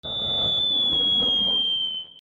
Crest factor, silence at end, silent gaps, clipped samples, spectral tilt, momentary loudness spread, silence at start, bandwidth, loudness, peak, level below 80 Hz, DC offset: 10 dB; 0 s; none; under 0.1%; -4 dB/octave; 6 LU; 0.05 s; 7.6 kHz; -20 LUFS; -14 dBFS; -52 dBFS; under 0.1%